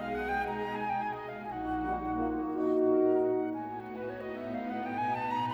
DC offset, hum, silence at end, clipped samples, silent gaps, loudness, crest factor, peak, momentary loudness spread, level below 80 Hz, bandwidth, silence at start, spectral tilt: under 0.1%; none; 0 s; under 0.1%; none; -33 LUFS; 16 dB; -16 dBFS; 12 LU; -56 dBFS; 7 kHz; 0 s; -7.5 dB/octave